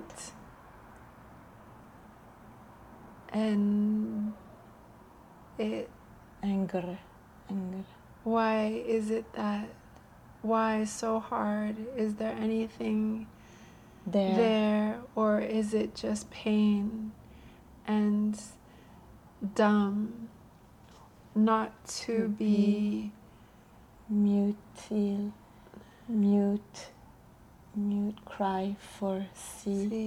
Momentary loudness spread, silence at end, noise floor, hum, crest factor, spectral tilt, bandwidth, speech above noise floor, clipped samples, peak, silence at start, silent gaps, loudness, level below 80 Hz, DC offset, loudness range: 18 LU; 0 s; -56 dBFS; none; 18 dB; -6.5 dB/octave; 12 kHz; 26 dB; under 0.1%; -14 dBFS; 0 s; none; -31 LUFS; -62 dBFS; under 0.1%; 5 LU